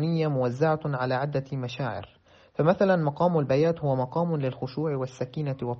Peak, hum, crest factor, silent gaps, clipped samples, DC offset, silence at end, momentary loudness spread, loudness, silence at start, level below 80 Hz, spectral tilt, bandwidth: -8 dBFS; none; 18 dB; none; under 0.1%; under 0.1%; 0 s; 9 LU; -27 LUFS; 0 s; -62 dBFS; -7 dB/octave; 7.2 kHz